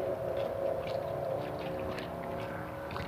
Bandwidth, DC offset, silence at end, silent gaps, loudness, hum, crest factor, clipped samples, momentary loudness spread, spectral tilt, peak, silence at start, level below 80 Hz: 15.5 kHz; under 0.1%; 0 s; none; -36 LUFS; none; 14 dB; under 0.1%; 5 LU; -6.5 dB/octave; -22 dBFS; 0 s; -56 dBFS